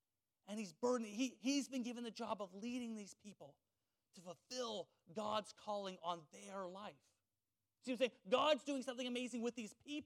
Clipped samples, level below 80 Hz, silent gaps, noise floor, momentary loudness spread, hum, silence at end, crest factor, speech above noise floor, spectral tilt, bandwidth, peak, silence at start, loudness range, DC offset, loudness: under 0.1%; under -90 dBFS; none; under -90 dBFS; 17 LU; none; 0 s; 22 dB; over 46 dB; -3.5 dB/octave; 14.5 kHz; -22 dBFS; 0.45 s; 6 LU; under 0.1%; -44 LUFS